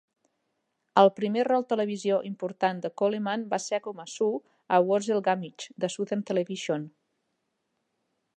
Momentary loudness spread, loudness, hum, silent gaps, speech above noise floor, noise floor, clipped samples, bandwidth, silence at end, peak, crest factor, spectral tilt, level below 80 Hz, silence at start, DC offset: 11 LU; -27 LUFS; none; none; 52 dB; -79 dBFS; under 0.1%; 10 kHz; 1.5 s; -6 dBFS; 24 dB; -5 dB/octave; -82 dBFS; 0.95 s; under 0.1%